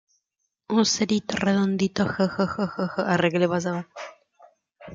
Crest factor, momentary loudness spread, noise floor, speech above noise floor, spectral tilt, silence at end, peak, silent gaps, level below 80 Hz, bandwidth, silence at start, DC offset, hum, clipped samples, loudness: 18 dB; 10 LU; -79 dBFS; 55 dB; -5 dB/octave; 0 s; -8 dBFS; none; -60 dBFS; 7.6 kHz; 0.7 s; under 0.1%; none; under 0.1%; -24 LUFS